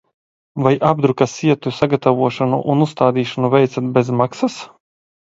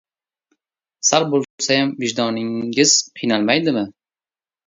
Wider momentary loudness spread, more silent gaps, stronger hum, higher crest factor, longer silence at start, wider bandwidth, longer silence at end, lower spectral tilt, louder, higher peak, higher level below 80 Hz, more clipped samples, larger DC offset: second, 4 LU vs 8 LU; second, none vs 1.50-1.58 s; neither; about the same, 16 dB vs 20 dB; second, 0.55 s vs 1.05 s; about the same, 8 kHz vs 7.8 kHz; about the same, 0.75 s vs 0.8 s; first, -7 dB/octave vs -2.5 dB/octave; about the same, -17 LUFS vs -18 LUFS; about the same, 0 dBFS vs 0 dBFS; first, -56 dBFS vs -64 dBFS; neither; neither